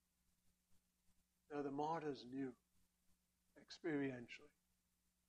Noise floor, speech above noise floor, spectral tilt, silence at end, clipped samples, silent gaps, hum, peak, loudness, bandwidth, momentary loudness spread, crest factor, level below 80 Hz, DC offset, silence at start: -86 dBFS; 38 dB; -6.5 dB/octave; 0.8 s; under 0.1%; none; none; -32 dBFS; -48 LUFS; 11 kHz; 13 LU; 20 dB; -86 dBFS; under 0.1%; 0.7 s